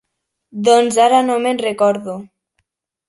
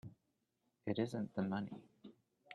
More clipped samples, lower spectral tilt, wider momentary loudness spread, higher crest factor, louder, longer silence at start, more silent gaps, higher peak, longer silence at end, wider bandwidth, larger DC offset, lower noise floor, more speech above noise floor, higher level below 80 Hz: neither; second, -4 dB/octave vs -7.5 dB/octave; second, 17 LU vs 22 LU; about the same, 16 dB vs 20 dB; first, -15 LUFS vs -42 LUFS; first, 0.55 s vs 0.05 s; neither; first, -2 dBFS vs -24 dBFS; first, 0.85 s vs 0 s; about the same, 11.5 kHz vs 11.5 kHz; neither; second, -70 dBFS vs -84 dBFS; first, 56 dB vs 43 dB; first, -64 dBFS vs -78 dBFS